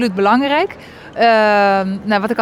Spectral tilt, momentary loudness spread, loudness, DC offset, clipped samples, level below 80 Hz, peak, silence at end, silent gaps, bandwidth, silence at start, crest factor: -6 dB/octave; 11 LU; -14 LUFS; under 0.1%; under 0.1%; -52 dBFS; -2 dBFS; 0 s; none; 14 kHz; 0 s; 12 dB